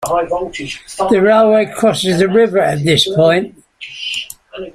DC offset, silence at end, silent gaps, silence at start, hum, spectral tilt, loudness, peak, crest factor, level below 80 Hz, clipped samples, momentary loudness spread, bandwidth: under 0.1%; 0.05 s; none; 0 s; none; -5 dB/octave; -13 LUFS; 0 dBFS; 14 dB; -48 dBFS; under 0.1%; 17 LU; 15.5 kHz